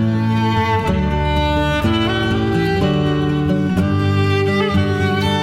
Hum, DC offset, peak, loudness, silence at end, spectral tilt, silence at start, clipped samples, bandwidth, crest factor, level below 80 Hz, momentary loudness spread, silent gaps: none; under 0.1%; -4 dBFS; -17 LUFS; 0 s; -7 dB/octave; 0 s; under 0.1%; 14 kHz; 12 dB; -30 dBFS; 1 LU; none